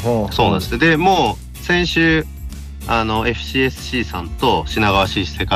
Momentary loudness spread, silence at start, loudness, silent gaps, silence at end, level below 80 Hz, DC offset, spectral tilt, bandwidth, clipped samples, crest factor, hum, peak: 11 LU; 0 s; -17 LUFS; none; 0 s; -30 dBFS; under 0.1%; -5 dB/octave; 16 kHz; under 0.1%; 14 dB; none; -4 dBFS